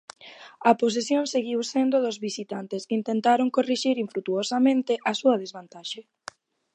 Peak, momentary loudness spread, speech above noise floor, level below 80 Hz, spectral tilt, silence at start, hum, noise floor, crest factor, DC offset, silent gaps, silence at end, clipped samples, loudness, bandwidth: -4 dBFS; 17 LU; 22 dB; -80 dBFS; -4 dB/octave; 0.2 s; none; -46 dBFS; 20 dB; under 0.1%; none; 0.75 s; under 0.1%; -25 LUFS; 9.8 kHz